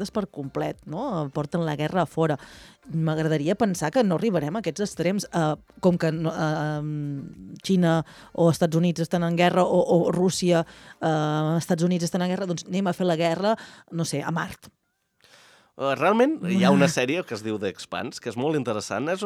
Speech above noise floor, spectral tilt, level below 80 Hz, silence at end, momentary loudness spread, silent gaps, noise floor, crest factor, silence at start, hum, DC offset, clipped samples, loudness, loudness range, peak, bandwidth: 41 dB; -6 dB/octave; -60 dBFS; 0 s; 11 LU; none; -65 dBFS; 18 dB; 0 s; none; under 0.1%; under 0.1%; -24 LUFS; 5 LU; -6 dBFS; 14.5 kHz